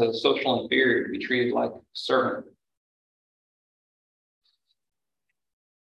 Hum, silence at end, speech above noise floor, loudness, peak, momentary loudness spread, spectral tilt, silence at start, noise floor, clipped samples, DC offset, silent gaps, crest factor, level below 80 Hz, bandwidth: none; 3.5 s; 59 dB; -25 LUFS; -6 dBFS; 9 LU; -5.5 dB/octave; 0 s; -84 dBFS; under 0.1%; under 0.1%; none; 22 dB; -70 dBFS; 10.5 kHz